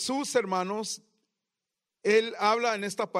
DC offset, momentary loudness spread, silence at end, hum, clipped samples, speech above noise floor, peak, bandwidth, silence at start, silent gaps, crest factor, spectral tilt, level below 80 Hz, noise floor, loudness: under 0.1%; 9 LU; 0 s; none; under 0.1%; 60 dB; -10 dBFS; 15.5 kHz; 0 s; none; 18 dB; -3 dB/octave; -78 dBFS; -88 dBFS; -28 LUFS